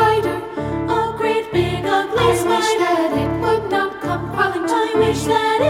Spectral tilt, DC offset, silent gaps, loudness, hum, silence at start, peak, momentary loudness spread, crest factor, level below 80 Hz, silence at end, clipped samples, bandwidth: -5 dB/octave; under 0.1%; none; -18 LUFS; none; 0 s; -4 dBFS; 6 LU; 14 dB; -40 dBFS; 0 s; under 0.1%; 16 kHz